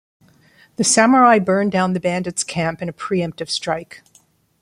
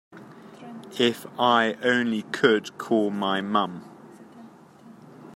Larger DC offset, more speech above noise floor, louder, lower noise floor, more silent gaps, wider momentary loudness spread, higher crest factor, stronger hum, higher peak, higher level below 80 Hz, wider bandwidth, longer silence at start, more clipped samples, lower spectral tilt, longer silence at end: neither; first, 39 dB vs 26 dB; first, -17 LUFS vs -24 LUFS; first, -56 dBFS vs -49 dBFS; neither; second, 13 LU vs 21 LU; about the same, 18 dB vs 22 dB; neither; about the same, -2 dBFS vs -4 dBFS; first, -58 dBFS vs -74 dBFS; about the same, 15.5 kHz vs 16 kHz; first, 0.8 s vs 0.15 s; neither; about the same, -4 dB/octave vs -5 dB/octave; first, 0.65 s vs 0 s